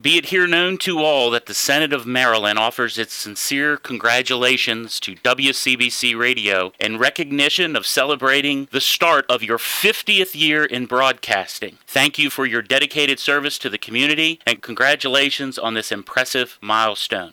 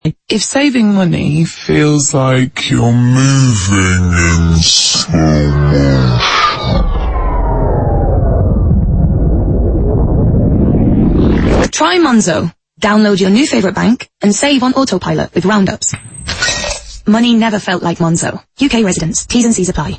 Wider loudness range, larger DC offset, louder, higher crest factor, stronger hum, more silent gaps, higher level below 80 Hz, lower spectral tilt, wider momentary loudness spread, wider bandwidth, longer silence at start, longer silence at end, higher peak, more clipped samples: about the same, 2 LU vs 3 LU; neither; second, -17 LUFS vs -11 LUFS; first, 18 dB vs 10 dB; neither; neither; second, -68 dBFS vs -20 dBFS; second, -2 dB/octave vs -5 dB/octave; about the same, 7 LU vs 6 LU; first, 19 kHz vs 8.8 kHz; about the same, 0.05 s vs 0.05 s; about the same, 0.05 s vs 0 s; about the same, -2 dBFS vs 0 dBFS; neither